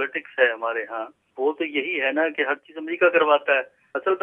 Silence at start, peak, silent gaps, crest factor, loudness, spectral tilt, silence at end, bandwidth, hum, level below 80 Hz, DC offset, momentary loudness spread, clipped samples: 0 s; -4 dBFS; none; 20 dB; -23 LUFS; -5.5 dB/octave; 0.05 s; 3.7 kHz; none; -82 dBFS; under 0.1%; 13 LU; under 0.1%